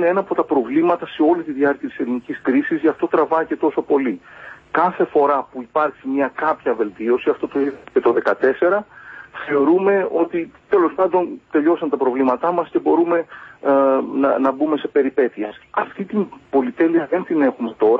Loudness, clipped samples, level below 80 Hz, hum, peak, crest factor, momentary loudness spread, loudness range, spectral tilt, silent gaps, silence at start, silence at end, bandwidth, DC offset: -19 LUFS; under 0.1%; -62 dBFS; none; -2 dBFS; 16 dB; 8 LU; 2 LU; -8.5 dB/octave; none; 0 s; 0 s; 4.9 kHz; under 0.1%